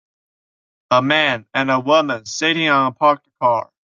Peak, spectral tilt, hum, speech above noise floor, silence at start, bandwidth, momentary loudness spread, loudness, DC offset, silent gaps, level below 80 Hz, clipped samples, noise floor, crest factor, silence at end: -2 dBFS; -4 dB/octave; none; over 73 dB; 0.9 s; 7.4 kHz; 5 LU; -17 LUFS; under 0.1%; none; -64 dBFS; under 0.1%; under -90 dBFS; 18 dB; 0.2 s